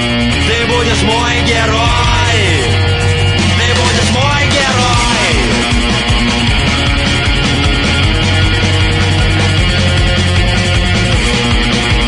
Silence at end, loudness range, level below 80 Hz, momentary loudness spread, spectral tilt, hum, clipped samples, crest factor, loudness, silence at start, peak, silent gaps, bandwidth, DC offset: 0 s; 1 LU; -20 dBFS; 1 LU; -4.5 dB/octave; none; under 0.1%; 10 dB; -11 LUFS; 0 s; 0 dBFS; none; 11 kHz; under 0.1%